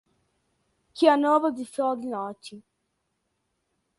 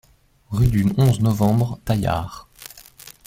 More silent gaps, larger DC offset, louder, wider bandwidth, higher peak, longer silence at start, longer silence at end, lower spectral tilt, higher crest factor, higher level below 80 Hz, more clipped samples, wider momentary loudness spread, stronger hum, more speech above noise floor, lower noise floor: neither; neither; second, -24 LUFS vs -20 LUFS; second, 11.5 kHz vs 16.5 kHz; about the same, -6 dBFS vs -4 dBFS; first, 0.95 s vs 0.5 s; first, 1.4 s vs 0.2 s; second, -4.5 dB/octave vs -7.5 dB/octave; first, 22 dB vs 16 dB; second, -76 dBFS vs -38 dBFS; neither; about the same, 23 LU vs 22 LU; neither; first, 53 dB vs 26 dB; first, -77 dBFS vs -45 dBFS